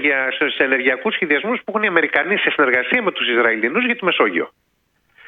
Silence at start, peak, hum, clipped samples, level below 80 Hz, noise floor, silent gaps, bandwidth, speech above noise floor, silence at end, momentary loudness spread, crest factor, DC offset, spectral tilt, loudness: 0 s; 0 dBFS; none; under 0.1%; -68 dBFS; -65 dBFS; none; 4.7 kHz; 47 dB; 0.8 s; 4 LU; 18 dB; under 0.1%; -6.5 dB/octave; -17 LUFS